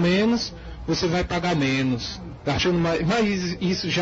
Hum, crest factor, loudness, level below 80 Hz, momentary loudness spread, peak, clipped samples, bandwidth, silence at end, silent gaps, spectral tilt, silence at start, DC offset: none; 12 dB; -23 LUFS; -42 dBFS; 8 LU; -12 dBFS; under 0.1%; 8 kHz; 0 s; none; -5.5 dB/octave; 0 s; under 0.1%